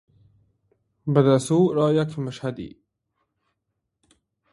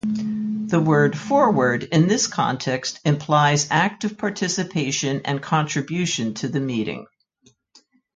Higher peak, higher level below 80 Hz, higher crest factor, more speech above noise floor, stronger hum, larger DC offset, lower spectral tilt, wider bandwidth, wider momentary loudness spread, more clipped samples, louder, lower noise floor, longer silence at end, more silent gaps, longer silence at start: about the same, -4 dBFS vs -4 dBFS; about the same, -62 dBFS vs -62 dBFS; about the same, 20 dB vs 18 dB; first, 58 dB vs 39 dB; neither; neither; first, -7 dB/octave vs -4.5 dB/octave; first, 11.5 kHz vs 9.4 kHz; first, 17 LU vs 8 LU; neither; about the same, -22 LUFS vs -21 LUFS; first, -79 dBFS vs -60 dBFS; first, 1.85 s vs 1.1 s; neither; first, 1.05 s vs 0.05 s